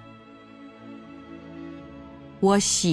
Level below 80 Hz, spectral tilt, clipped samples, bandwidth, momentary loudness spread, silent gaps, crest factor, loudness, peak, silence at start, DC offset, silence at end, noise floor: -54 dBFS; -4 dB/octave; under 0.1%; 11 kHz; 26 LU; none; 20 dB; -21 LUFS; -8 dBFS; 0.6 s; under 0.1%; 0 s; -47 dBFS